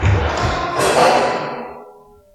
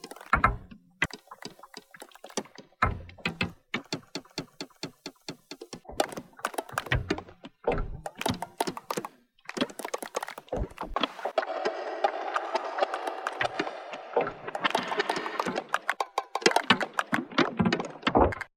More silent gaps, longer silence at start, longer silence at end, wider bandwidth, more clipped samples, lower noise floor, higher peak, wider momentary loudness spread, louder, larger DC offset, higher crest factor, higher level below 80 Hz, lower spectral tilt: neither; about the same, 0 s vs 0.05 s; first, 0.45 s vs 0.1 s; second, 13 kHz vs 19.5 kHz; neither; second, -44 dBFS vs -50 dBFS; first, 0 dBFS vs -4 dBFS; about the same, 15 LU vs 17 LU; first, -16 LUFS vs -31 LUFS; neither; second, 18 dB vs 28 dB; first, -30 dBFS vs -46 dBFS; about the same, -4.5 dB/octave vs -4 dB/octave